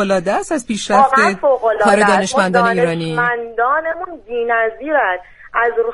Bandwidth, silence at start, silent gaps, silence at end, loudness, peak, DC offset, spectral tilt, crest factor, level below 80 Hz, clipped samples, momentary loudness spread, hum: 11.5 kHz; 0 s; none; 0 s; -15 LUFS; 0 dBFS; under 0.1%; -4.5 dB/octave; 16 dB; -48 dBFS; under 0.1%; 9 LU; none